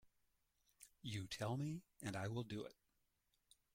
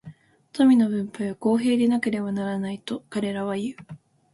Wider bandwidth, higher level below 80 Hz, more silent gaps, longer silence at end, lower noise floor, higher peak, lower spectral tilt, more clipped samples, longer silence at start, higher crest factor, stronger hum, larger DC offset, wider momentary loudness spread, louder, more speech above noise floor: first, 16.5 kHz vs 11.5 kHz; second, -76 dBFS vs -66 dBFS; neither; first, 1.05 s vs 0.35 s; first, -84 dBFS vs -47 dBFS; second, -32 dBFS vs -8 dBFS; about the same, -5.5 dB/octave vs -6.5 dB/octave; neither; about the same, 0.05 s vs 0.05 s; about the same, 18 dB vs 16 dB; neither; neither; about the same, 13 LU vs 13 LU; second, -48 LUFS vs -24 LUFS; first, 38 dB vs 24 dB